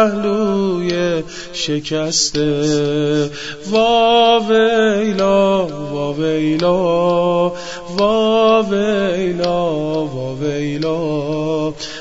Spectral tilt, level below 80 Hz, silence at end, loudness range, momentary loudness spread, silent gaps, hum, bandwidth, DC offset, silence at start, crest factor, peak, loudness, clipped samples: -4.5 dB/octave; -46 dBFS; 0 s; 3 LU; 9 LU; none; none; 8 kHz; 1%; 0 s; 14 dB; -2 dBFS; -16 LUFS; under 0.1%